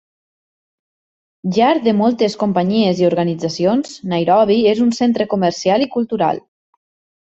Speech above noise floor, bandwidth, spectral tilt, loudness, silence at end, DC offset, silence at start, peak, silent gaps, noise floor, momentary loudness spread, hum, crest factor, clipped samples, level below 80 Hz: over 75 dB; 8 kHz; -6 dB/octave; -16 LUFS; 0.9 s; under 0.1%; 1.45 s; -2 dBFS; none; under -90 dBFS; 6 LU; none; 14 dB; under 0.1%; -58 dBFS